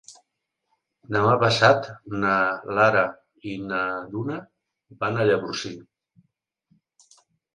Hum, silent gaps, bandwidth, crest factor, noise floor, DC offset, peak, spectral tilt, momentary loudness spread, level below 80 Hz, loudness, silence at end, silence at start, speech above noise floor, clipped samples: none; none; 11 kHz; 24 dB; -79 dBFS; under 0.1%; -2 dBFS; -5.5 dB/octave; 16 LU; -60 dBFS; -23 LUFS; 1.75 s; 0.1 s; 57 dB; under 0.1%